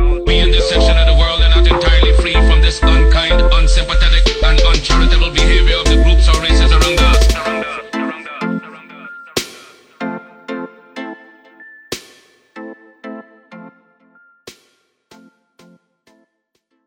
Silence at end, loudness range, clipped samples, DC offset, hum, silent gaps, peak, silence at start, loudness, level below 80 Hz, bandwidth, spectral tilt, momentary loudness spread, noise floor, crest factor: 3.25 s; 21 LU; under 0.1%; under 0.1%; none; none; 0 dBFS; 0 s; -13 LUFS; -14 dBFS; 10 kHz; -4.5 dB/octave; 21 LU; -67 dBFS; 12 dB